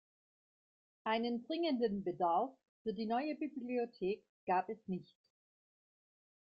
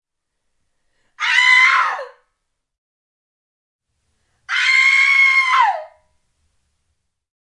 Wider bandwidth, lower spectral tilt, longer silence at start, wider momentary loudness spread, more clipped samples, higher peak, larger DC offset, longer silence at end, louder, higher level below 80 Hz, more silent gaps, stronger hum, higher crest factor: second, 5.4 kHz vs 11.5 kHz; first, -8.5 dB/octave vs 3.5 dB/octave; second, 1.05 s vs 1.2 s; second, 9 LU vs 13 LU; neither; second, -22 dBFS vs 0 dBFS; neither; second, 1.4 s vs 1.6 s; second, -39 LUFS vs -12 LUFS; second, -78 dBFS vs -72 dBFS; second, 2.69-2.85 s, 4.29-4.47 s vs 2.78-3.79 s; neither; about the same, 18 dB vs 18 dB